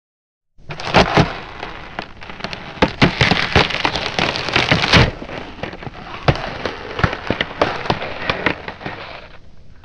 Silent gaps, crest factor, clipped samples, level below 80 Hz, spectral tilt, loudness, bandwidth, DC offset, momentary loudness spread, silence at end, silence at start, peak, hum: none; 20 dB; under 0.1%; -34 dBFS; -5 dB/octave; -17 LUFS; 10 kHz; under 0.1%; 18 LU; 0.05 s; 0.6 s; 0 dBFS; none